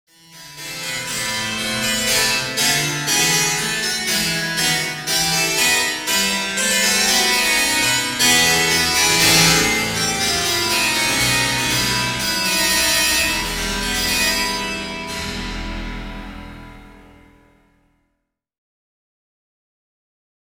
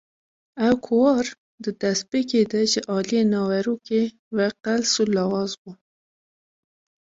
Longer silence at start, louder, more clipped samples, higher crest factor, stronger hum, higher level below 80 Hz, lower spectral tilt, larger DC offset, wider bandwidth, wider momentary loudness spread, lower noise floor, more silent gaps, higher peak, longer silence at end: second, 0.3 s vs 0.55 s; first, -16 LUFS vs -22 LUFS; neither; about the same, 18 dB vs 16 dB; neither; first, -40 dBFS vs -62 dBFS; second, -1 dB/octave vs -4.5 dB/octave; neither; first, 17 kHz vs 7.8 kHz; first, 13 LU vs 7 LU; second, -75 dBFS vs under -90 dBFS; second, none vs 1.38-1.58 s, 4.19-4.31 s, 5.58-5.65 s; first, -2 dBFS vs -6 dBFS; first, 3.55 s vs 1.3 s